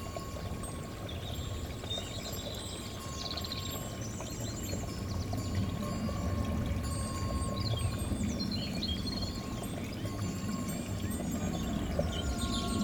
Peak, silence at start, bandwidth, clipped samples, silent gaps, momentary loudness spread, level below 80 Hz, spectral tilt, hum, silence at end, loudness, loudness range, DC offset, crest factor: -18 dBFS; 0 s; over 20 kHz; under 0.1%; none; 6 LU; -44 dBFS; -5 dB/octave; none; 0 s; -36 LUFS; 4 LU; under 0.1%; 18 dB